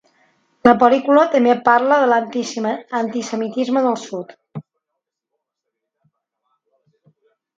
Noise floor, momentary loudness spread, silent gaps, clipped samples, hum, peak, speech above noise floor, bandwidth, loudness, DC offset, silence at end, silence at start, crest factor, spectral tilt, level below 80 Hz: -80 dBFS; 18 LU; none; under 0.1%; none; 0 dBFS; 64 dB; 7.8 kHz; -16 LUFS; under 0.1%; 3 s; 0.65 s; 18 dB; -5 dB/octave; -64 dBFS